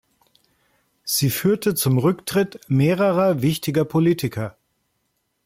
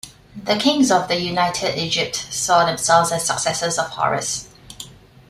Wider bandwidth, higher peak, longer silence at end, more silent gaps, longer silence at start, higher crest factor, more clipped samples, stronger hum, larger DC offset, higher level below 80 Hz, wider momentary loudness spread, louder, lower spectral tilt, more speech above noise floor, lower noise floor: about the same, 16.5 kHz vs 15.5 kHz; second, -8 dBFS vs -2 dBFS; first, 0.95 s vs 0.4 s; neither; first, 1.05 s vs 0.05 s; about the same, 14 dB vs 18 dB; neither; neither; neither; about the same, -58 dBFS vs -54 dBFS; second, 7 LU vs 20 LU; about the same, -20 LUFS vs -19 LUFS; first, -5.5 dB/octave vs -3 dB/octave; first, 52 dB vs 21 dB; first, -72 dBFS vs -40 dBFS